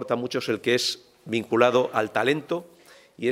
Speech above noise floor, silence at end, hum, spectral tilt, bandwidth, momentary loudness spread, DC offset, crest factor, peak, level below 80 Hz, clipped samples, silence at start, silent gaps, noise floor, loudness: 25 dB; 0 s; none; -4 dB/octave; 16 kHz; 11 LU; under 0.1%; 22 dB; -2 dBFS; -74 dBFS; under 0.1%; 0 s; none; -49 dBFS; -24 LUFS